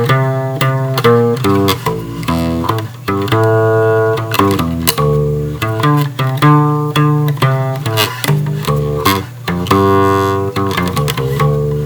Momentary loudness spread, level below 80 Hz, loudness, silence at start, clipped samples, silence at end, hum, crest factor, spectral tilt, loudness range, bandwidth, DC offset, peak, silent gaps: 7 LU; -36 dBFS; -13 LUFS; 0 s; 0.1%; 0 s; none; 12 dB; -6 dB/octave; 1 LU; over 20 kHz; under 0.1%; 0 dBFS; none